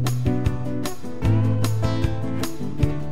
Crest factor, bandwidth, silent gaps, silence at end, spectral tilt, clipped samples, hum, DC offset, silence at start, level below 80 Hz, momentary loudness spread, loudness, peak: 16 dB; 15.5 kHz; none; 0 s; -7 dB/octave; under 0.1%; none; 5%; 0 s; -34 dBFS; 8 LU; -24 LUFS; -6 dBFS